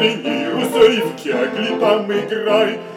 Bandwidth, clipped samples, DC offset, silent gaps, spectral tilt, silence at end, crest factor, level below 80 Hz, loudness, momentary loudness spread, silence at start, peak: 16 kHz; under 0.1%; under 0.1%; none; -4.5 dB/octave; 0 s; 14 dB; -60 dBFS; -17 LUFS; 7 LU; 0 s; -2 dBFS